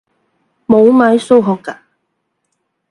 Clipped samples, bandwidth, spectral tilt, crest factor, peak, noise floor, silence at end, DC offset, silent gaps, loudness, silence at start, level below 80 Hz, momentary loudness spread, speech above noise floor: under 0.1%; 11 kHz; -7 dB/octave; 14 dB; 0 dBFS; -69 dBFS; 1.15 s; under 0.1%; none; -11 LUFS; 0.7 s; -56 dBFS; 18 LU; 59 dB